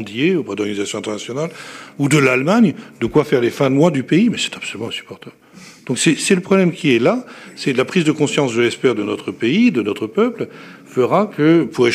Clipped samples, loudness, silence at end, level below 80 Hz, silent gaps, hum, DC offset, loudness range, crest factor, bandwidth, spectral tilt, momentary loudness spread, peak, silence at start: under 0.1%; -17 LUFS; 0 s; -58 dBFS; none; none; under 0.1%; 2 LU; 16 dB; 15 kHz; -5 dB/octave; 12 LU; -2 dBFS; 0 s